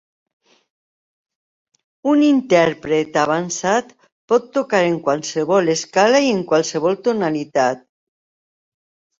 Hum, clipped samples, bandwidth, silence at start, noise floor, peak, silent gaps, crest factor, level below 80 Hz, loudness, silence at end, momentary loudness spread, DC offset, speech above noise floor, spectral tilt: none; under 0.1%; 7.8 kHz; 2.05 s; under -90 dBFS; -2 dBFS; 4.12-4.28 s; 18 dB; -62 dBFS; -18 LUFS; 1.4 s; 6 LU; under 0.1%; over 73 dB; -4.5 dB/octave